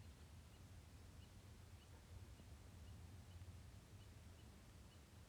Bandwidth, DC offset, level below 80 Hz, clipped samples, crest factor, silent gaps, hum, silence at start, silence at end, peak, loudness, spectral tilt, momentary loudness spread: 19.5 kHz; under 0.1%; -66 dBFS; under 0.1%; 14 dB; none; none; 0 s; 0 s; -48 dBFS; -62 LUFS; -5 dB/octave; 3 LU